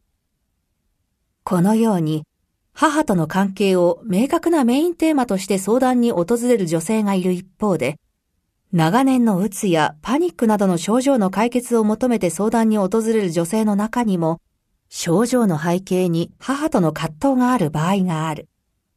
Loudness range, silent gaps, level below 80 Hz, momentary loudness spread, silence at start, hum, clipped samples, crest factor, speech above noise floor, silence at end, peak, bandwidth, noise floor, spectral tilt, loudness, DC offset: 2 LU; none; -54 dBFS; 7 LU; 1.45 s; none; under 0.1%; 16 dB; 53 dB; 0.55 s; -2 dBFS; 14 kHz; -71 dBFS; -6 dB/octave; -19 LUFS; under 0.1%